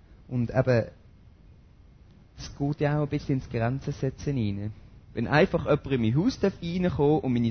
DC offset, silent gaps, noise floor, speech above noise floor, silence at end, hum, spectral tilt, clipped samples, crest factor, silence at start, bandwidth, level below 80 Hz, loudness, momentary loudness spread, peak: under 0.1%; none; -53 dBFS; 28 dB; 0 s; none; -7.5 dB/octave; under 0.1%; 20 dB; 0.1 s; 6.6 kHz; -48 dBFS; -27 LUFS; 11 LU; -8 dBFS